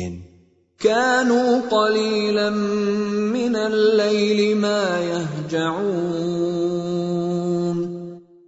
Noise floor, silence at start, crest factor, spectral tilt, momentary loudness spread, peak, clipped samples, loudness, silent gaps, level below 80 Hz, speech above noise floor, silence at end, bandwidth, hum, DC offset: -55 dBFS; 0 s; 16 dB; -5.5 dB/octave; 7 LU; -4 dBFS; under 0.1%; -20 LUFS; none; -58 dBFS; 36 dB; 0.25 s; 8 kHz; none; under 0.1%